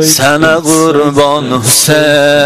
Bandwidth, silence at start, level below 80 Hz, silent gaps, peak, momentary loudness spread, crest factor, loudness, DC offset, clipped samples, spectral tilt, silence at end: 16.5 kHz; 0 s; -46 dBFS; none; 0 dBFS; 4 LU; 8 dB; -7 LUFS; under 0.1%; 0.6%; -3 dB/octave; 0 s